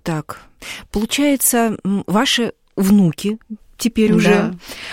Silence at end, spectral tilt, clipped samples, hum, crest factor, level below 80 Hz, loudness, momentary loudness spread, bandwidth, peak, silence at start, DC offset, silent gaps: 0 s; -4.5 dB/octave; under 0.1%; none; 16 dB; -44 dBFS; -17 LUFS; 17 LU; 17 kHz; 0 dBFS; 0.05 s; under 0.1%; none